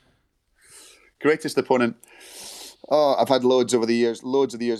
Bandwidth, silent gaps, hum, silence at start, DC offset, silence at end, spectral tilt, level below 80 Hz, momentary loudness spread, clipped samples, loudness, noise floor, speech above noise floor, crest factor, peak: 13.5 kHz; none; none; 1.2 s; under 0.1%; 0 s; -4.5 dB/octave; -70 dBFS; 18 LU; under 0.1%; -21 LUFS; -67 dBFS; 46 dB; 18 dB; -6 dBFS